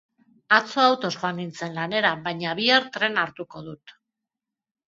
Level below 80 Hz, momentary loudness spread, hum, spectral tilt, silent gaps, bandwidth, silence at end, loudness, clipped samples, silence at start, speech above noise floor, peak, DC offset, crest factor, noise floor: -70 dBFS; 16 LU; none; -4 dB/octave; none; 7.8 kHz; 0.95 s; -23 LUFS; under 0.1%; 0.5 s; 63 dB; -2 dBFS; under 0.1%; 24 dB; -87 dBFS